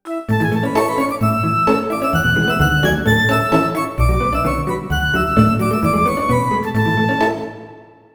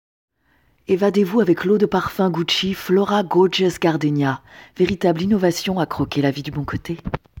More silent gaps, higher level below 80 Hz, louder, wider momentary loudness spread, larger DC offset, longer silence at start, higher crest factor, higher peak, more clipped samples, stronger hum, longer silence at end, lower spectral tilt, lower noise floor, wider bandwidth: neither; first, -28 dBFS vs -46 dBFS; first, -16 LUFS vs -19 LUFS; second, 5 LU vs 10 LU; neither; second, 0.05 s vs 0.9 s; about the same, 16 dB vs 16 dB; first, 0 dBFS vs -4 dBFS; neither; neither; first, 0.35 s vs 0 s; about the same, -6 dB/octave vs -6 dB/octave; second, -40 dBFS vs -61 dBFS; first, over 20 kHz vs 17 kHz